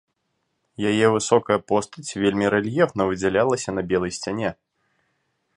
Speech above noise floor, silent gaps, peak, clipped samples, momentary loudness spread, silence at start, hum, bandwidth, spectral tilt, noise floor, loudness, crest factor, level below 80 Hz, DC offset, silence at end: 53 dB; none; -2 dBFS; under 0.1%; 8 LU; 0.8 s; none; 11 kHz; -5 dB/octave; -74 dBFS; -22 LUFS; 20 dB; -54 dBFS; under 0.1%; 1.05 s